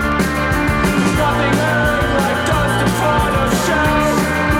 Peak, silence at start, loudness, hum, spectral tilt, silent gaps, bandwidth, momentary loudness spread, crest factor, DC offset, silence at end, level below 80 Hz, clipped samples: -2 dBFS; 0 s; -15 LUFS; none; -5 dB/octave; none; 17 kHz; 1 LU; 14 dB; under 0.1%; 0 s; -28 dBFS; under 0.1%